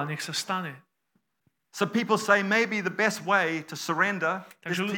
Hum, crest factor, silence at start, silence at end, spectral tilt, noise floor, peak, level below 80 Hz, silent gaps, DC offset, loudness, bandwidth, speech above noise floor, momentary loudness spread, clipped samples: none; 20 dB; 0 s; 0 s; -4 dB/octave; -75 dBFS; -8 dBFS; -86 dBFS; none; under 0.1%; -26 LUFS; 17.5 kHz; 48 dB; 10 LU; under 0.1%